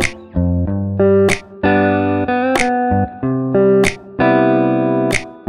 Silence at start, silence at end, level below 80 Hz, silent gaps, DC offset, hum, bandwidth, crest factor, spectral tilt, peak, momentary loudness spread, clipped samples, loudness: 0 s; 0.1 s; -36 dBFS; none; under 0.1%; none; 15 kHz; 14 dB; -6 dB/octave; 0 dBFS; 6 LU; under 0.1%; -15 LUFS